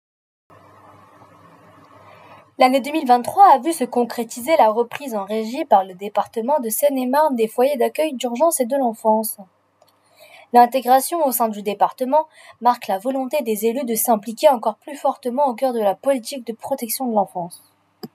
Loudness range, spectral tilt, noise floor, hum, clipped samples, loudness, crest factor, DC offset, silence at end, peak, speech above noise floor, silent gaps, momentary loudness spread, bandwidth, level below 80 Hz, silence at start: 3 LU; -3.5 dB/octave; -59 dBFS; none; under 0.1%; -19 LUFS; 18 dB; under 0.1%; 0.1 s; 0 dBFS; 40 dB; none; 10 LU; 16 kHz; -82 dBFS; 2.3 s